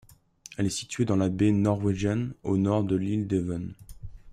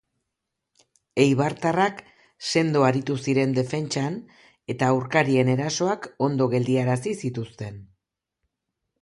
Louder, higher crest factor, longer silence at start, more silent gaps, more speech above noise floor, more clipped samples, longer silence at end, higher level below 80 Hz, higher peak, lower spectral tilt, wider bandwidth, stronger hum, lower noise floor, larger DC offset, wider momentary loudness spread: second, -27 LUFS vs -23 LUFS; about the same, 16 dB vs 20 dB; second, 0.5 s vs 1.15 s; neither; second, 25 dB vs 59 dB; neither; second, 0 s vs 1.15 s; first, -50 dBFS vs -62 dBFS; second, -12 dBFS vs -6 dBFS; about the same, -6.5 dB/octave vs -6 dB/octave; about the same, 12.5 kHz vs 11.5 kHz; neither; second, -51 dBFS vs -82 dBFS; neither; first, 17 LU vs 13 LU